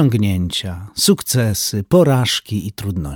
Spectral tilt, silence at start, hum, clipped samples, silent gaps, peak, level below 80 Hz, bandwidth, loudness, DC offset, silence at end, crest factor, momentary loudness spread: -5 dB/octave; 0 s; none; under 0.1%; none; -2 dBFS; -40 dBFS; 19 kHz; -17 LUFS; under 0.1%; 0 s; 16 dB; 11 LU